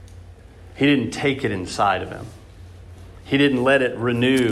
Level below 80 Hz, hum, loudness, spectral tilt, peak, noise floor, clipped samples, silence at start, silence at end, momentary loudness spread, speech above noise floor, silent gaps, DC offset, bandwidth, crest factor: -48 dBFS; none; -20 LUFS; -5.5 dB/octave; -4 dBFS; -43 dBFS; under 0.1%; 0 s; 0 s; 9 LU; 23 dB; none; under 0.1%; 13 kHz; 18 dB